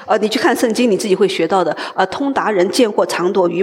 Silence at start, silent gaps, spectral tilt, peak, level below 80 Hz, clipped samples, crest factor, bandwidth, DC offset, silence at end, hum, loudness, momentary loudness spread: 0 s; none; -4.5 dB/octave; -2 dBFS; -62 dBFS; under 0.1%; 14 dB; 16.5 kHz; under 0.1%; 0 s; none; -15 LUFS; 4 LU